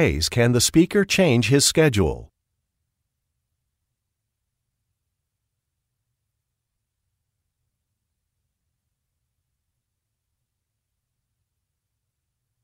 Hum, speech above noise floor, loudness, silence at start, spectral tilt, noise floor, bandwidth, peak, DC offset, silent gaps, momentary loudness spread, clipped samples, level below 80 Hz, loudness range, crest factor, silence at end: none; 62 dB; -18 LUFS; 0 s; -4.5 dB/octave; -80 dBFS; 16 kHz; -4 dBFS; under 0.1%; none; 6 LU; under 0.1%; -44 dBFS; 8 LU; 22 dB; 10.4 s